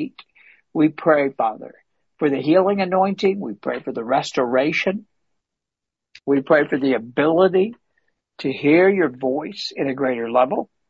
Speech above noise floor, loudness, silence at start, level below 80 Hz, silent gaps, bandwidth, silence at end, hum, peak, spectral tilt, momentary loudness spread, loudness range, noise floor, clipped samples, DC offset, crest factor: 67 dB; -20 LUFS; 0 s; -66 dBFS; none; 8 kHz; 0.25 s; none; -2 dBFS; -6.5 dB/octave; 11 LU; 3 LU; -86 dBFS; under 0.1%; under 0.1%; 18 dB